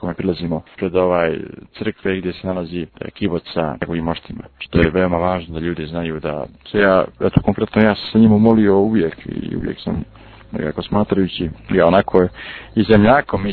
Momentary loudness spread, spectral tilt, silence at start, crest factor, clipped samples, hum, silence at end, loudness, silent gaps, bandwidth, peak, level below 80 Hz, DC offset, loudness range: 14 LU; -10.5 dB/octave; 0 s; 18 dB; under 0.1%; none; 0 s; -18 LUFS; none; 4.5 kHz; 0 dBFS; -38 dBFS; under 0.1%; 6 LU